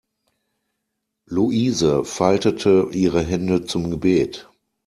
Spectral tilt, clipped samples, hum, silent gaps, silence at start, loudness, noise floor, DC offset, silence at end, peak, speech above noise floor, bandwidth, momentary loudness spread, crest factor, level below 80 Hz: -6 dB/octave; under 0.1%; none; none; 1.3 s; -20 LUFS; -78 dBFS; under 0.1%; 0.45 s; -2 dBFS; 59 dB; 13 kHz; 7 LU; 18 dB; -48 dBFS